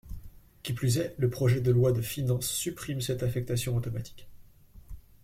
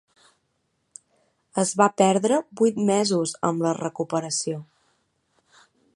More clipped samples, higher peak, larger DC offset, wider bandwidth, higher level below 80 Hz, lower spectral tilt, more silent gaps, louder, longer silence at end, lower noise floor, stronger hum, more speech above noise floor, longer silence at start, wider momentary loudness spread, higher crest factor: neither; second, -14 dBFS vs -2 dBFS; neither; first, 16.5 kHz vs 11.5 kHz; first, -50 dBFS vs -70 dBFS; about the same, -5.5 dB/octave vs -4.5 dB/octave; neither; second, -29 LUFS vs -23 LUFS; second, 0.25 s vs 1.35 s; second, -52 dBFS vs -73 dBFS; neither; second, 24 dB vs 51 dB; second, 0.05 s vs 1.55 s; first, 15 LU vs 9 LU; second, 16 dB vs 22 dB